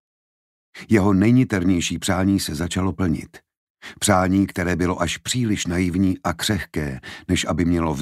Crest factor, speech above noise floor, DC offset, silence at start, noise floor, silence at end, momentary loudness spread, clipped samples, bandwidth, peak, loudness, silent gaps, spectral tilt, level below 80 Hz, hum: 18 dB; over 70 dB; under 0.1%; 0.75 s; under -90 dBFS; 0 s; 7 LU; under 0.1%; 15.5 kHz; -4 dBFS; -21 LUFS; 3.57-3.75 s; -5 dB/octave; -42 dBFS; none